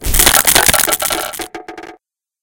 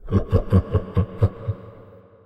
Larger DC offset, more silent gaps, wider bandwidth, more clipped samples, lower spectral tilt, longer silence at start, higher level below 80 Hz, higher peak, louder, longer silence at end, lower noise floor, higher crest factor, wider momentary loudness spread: neither; neither; first, over 20 kHz vs 5 kHz; first, 0.6% vs under 0.1%; second, -1 dB/octave vs -10.5 dB/octave; about the same, 0 s vs 0.05 s; first, -26 dBFS vs -32 dBFS; first, 0 dBFS vs -4 dBFS; first, -10 LUFS vs -23 LUFS; about the same, 0.5 s vs 0.5 s; about the same, -49 dBFS vs -46 dBFS; about the same, 14 dB vs 18 dB; first, 21 LU vs 12 LU